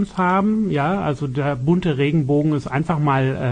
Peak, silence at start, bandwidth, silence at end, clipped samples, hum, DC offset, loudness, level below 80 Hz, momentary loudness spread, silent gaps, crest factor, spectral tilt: -6 dBFS; 0 s; 9.6 kHz; 0 s; under 0.1%; none; under 0.1%; -19 LUFS; -46 dBFS; 4 LU; none; 12 dB; -8.5 dB/octave